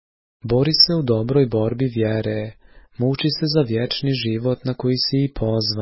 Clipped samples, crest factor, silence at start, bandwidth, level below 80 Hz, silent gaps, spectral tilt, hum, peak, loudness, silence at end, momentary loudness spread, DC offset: under 0.1%; 20 dB; 0.45 s; 6 kHz; -44 dBFS; none; -8.5 dB/octave; none; 0 dBFS; -20 LUFS; 0 s; 9 LU; under 0.1%